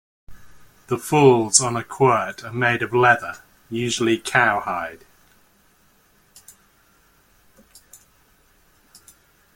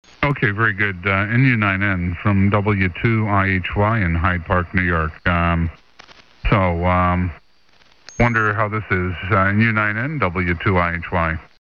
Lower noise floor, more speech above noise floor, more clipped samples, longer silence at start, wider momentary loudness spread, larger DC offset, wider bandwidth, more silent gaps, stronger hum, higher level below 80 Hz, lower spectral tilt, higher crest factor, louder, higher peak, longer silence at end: about the same, -58 dBFS vs -56 dBFS; about the same, 39 dB vs 38 dB; neither; about the same, 0.3 s vs 0.2 s; first, 14 LU vs 5 LU; second, under 0.1% vs 0.2%; first, 16.5 kHz vs 6.8 kHz; neither; neither; second, -58 dBFS vs -34 dBFS; second, -3.5 dB/octave vs -8 dB/octave; first, 24 dB vs 18 dB; about the same, -19 LUFS vs -18 LUFS; about the same, 0 dBFS vs 0 dBFS; first, 4.6 s vs 0.15 s